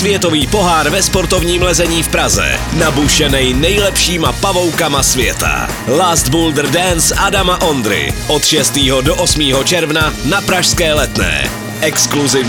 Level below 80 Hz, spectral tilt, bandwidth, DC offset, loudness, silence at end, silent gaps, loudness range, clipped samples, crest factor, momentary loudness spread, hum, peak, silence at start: -24 dBFS; -3 dB/octave; 19 kHz; under 0.1%; -11 LUFS; 0 s; none; 1 LU; under 0.1%; 12 dB; 4 LU; none; 0 dBFS; 0 s